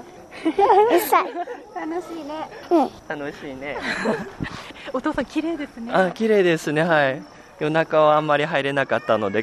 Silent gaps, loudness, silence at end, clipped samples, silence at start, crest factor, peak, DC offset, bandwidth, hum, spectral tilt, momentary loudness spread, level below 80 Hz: none; -21 LUFS; 0 s; under 0.1%; 0 s; 18 dB; -4 dBFS; under 0.1%; 13 kHz; none; -5.5 dB/octave; 15 LU; -54 dBFS